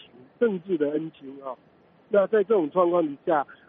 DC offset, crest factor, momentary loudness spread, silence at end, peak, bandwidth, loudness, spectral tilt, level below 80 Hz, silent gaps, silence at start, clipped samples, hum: under 0.1%; 16 dB; 17 LU; 0.15 s; -10 dBFS; 3.9 kHz; -24 LUFS; -6 dB/octave; -76 dBFS; none; 0.4 s; under 0.1%; none